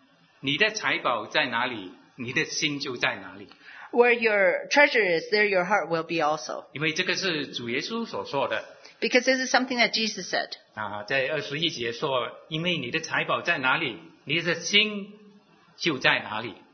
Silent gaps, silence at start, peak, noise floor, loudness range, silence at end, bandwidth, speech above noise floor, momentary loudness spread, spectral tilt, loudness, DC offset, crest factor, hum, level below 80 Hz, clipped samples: none; 0.45 s; -2 dBFS; -56 dBFS; 5 LU; 0.15 s; 6.6 kHz; 30 dB; 12 LU; -3 dB/octave; -25 LUFS; under 0.1%; 24 dB; none; -72 dBFS; under 0.1%